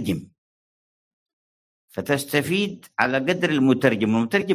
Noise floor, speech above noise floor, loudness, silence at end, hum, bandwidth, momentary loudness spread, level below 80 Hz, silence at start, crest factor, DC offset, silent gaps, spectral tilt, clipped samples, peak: under -90 dBFS; over 69 dB; -22 LUFS; 0 s; none; 16 kHz; 10 LU; -58 dBFS; 0 s; 20 dB; under 0.1%; 0.38-1.26 s, 1.33-1.88 s; -5.5 dB/octave; under 0.1%; -2 dBFS